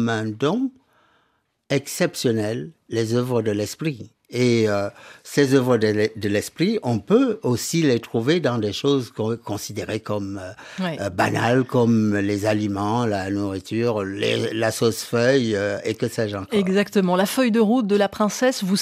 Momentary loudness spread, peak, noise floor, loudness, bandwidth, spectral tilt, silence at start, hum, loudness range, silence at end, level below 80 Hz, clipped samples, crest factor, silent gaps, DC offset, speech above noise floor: 9 LU; -4 dBFS; -67 dBFS; -22 LUFS; 15.5 kHz; -5.5 dB/octave; 0 s; none; 4 LU; 0 s; -64 dBFS; under 0.1%; 18 dB; none; under 0.1%; 46 dB